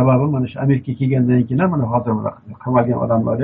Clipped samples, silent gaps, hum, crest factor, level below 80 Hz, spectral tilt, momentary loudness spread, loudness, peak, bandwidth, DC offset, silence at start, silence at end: under 0.1%; none; none; 14 dB; -52 dBFS; -9.5 dB/octave; 6 LU; -18 LUFS; -2 dBFS; 3.8 kHz; under 0.1%; 0 s; 0 s